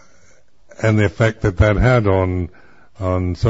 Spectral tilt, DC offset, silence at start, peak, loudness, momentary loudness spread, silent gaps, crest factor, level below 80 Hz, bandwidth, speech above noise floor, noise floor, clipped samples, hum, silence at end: -7.5 dB/octave; 0.6%; 0.8 s; -2 dBFS; -17 LUFS; 10 LU; none; 16 dB; -30 dBFS; 7.8 kHz; 38 dB; -54 dBFS; under 0.1%; none; 0 s